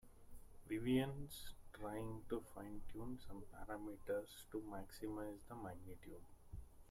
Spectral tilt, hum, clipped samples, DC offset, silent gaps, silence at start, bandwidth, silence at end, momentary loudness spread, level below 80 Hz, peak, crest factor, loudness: -6 dB/octave; none; under 0.1%; under 0.1%; none; 0.05 s; 16.5 kHz; 0 s; 18 LU; -60 dBFS; -28 dBFS; 20 dB; -48 LUFS